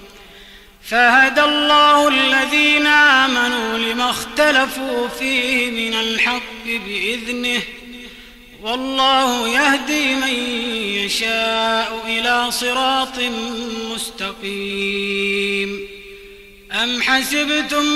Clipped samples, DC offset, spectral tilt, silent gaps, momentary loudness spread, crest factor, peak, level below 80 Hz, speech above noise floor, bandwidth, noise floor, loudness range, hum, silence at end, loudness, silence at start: under 0.1%; under 0.1%; -2 dB/octave; none; 13 LU; 14 dB; -4 dBFS; -48 dBFS; 25 dB; 16 kHz; -42 dBFS; 8 LU; none; 0 s; -16 LUFS; 0 s